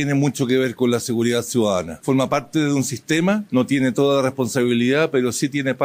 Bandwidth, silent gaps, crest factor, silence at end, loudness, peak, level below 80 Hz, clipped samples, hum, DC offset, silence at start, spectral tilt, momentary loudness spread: 16 kHz; none; 12 dB; 0 s; -20 LUFS; -6 dBFS; -62 dBFS; under 0.1%; none; under 0.1%; 0 s; -5 dB/octave; 4 LU